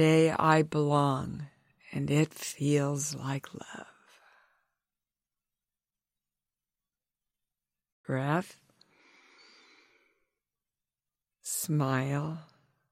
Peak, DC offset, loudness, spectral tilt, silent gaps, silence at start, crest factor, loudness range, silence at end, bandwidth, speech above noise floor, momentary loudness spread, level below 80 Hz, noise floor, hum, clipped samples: -10 dBFS; under 0.1%; -30 LUFS; -5.5 dB/octave; 7.92-8.04 s; 0 s; 22 dB; 15 LU; 0.5 s; 16 kHz; over 62 dB; 20 LU; -68 dBFS; under -90 dBFS; none; under 0.1%